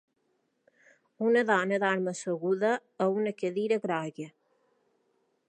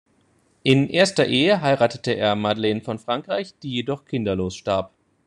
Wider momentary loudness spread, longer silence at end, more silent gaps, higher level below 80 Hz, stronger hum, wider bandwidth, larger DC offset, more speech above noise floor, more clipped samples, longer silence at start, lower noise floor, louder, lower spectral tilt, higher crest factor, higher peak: about the same, 8 LU vs 10 LU; first, 1.2 s vs 0.4 s; neither; second, -86 dBFS vs -58 dBFS; neither; second, 9.8 kHz vs 11 kHz; neither; first, 47 dB vs 41 dB; neither; first, 1.2 s vs 0.65 s; first, -75 dBFS vs -62 dBFS; second, -29 LUFS vs -22 LUFS; about the same, -5.5 dB/octave vs -5.5 dB/octave; about the same, 20 dB vs 20 dB; second, -10 dBFS vs -2 dBFS